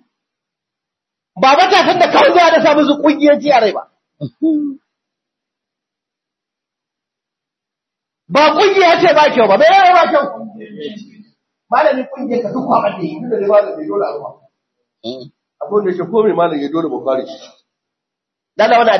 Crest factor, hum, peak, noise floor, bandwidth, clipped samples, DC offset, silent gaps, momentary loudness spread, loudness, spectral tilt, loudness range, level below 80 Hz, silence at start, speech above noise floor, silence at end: 14 dB; none; 0 dBFS; -83 dBFS; 7.6 kHz; under 0.1%; under 0.1%; none; 20 LU; -12 LUFS; -5 dB/octave; 8 LU; -66 dBFS; 1.35 s; 71 dB; 0 s